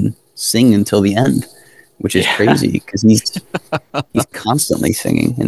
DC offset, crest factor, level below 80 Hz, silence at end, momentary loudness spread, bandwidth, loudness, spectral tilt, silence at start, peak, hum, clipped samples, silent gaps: 0.2%; 14 dB; -42 dBFS; 0 s; 10 LU; 13 kHz; -15 LUFS; -5 dB/octave; 0 s; 0 dBFS; none; under 0.1%; none